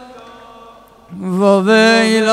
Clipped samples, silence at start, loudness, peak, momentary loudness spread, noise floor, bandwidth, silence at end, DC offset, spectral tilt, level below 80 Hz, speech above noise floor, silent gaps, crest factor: under 0.1%; 0 s; -11 LUFS; 0 dBFS; 12 LU; -41 dBFS; 14.5 kHz; 0 s; under 0.1%; -5 dB/octave; -58 dBFS; 30 dB; none; 14 dB